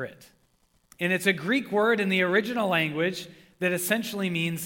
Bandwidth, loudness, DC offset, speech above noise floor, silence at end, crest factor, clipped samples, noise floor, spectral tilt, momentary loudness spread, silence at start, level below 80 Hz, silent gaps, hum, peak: 18 kHz; -25 LUFS; under 0.1%; 40 dB; 0 s; 18 dB; under 0.1%; -67 dBFS; -4.5 dB/octave; 8 LU; 0 s; -70 dBFS; none; none; -8 dBFS